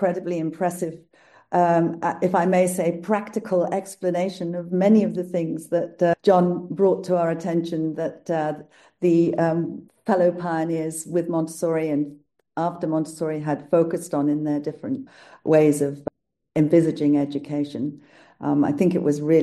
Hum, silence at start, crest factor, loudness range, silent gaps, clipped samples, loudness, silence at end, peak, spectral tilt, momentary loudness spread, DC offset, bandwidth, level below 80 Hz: none; 0 s; 16 dB; 3 LU; none; under 0.1%; -23 LUFS; 0 s; -6 dBFS; -7 dB/octave; 11 LU; under 0.1%; 12.5 kHz; -68 dBFS